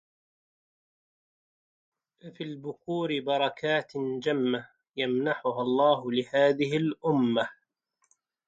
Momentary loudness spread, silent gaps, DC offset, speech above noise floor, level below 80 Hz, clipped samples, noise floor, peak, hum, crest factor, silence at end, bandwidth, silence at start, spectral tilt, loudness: 13 LU; none; under 0.1%; 48 dB; -74 dBFS; under 0.1%; -76 dBFS; -12 dBFS; none; 18 dB; 0.95 s; 7.8 kHz; 2.25 s; -6.5 dB/octave; -28 LUFS